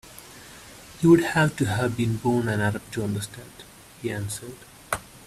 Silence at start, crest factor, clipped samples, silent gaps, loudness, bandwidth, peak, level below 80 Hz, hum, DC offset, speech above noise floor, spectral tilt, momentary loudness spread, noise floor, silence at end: 0.05 s; 20 dB; under 0.1%; none; -24 LUFS; 15 kHz; -6 dBFS; -52 dBFS; none; under 0.1%; 22 dB; -6 dB/octave; 25 LU; -45 dBFS; 0.1 s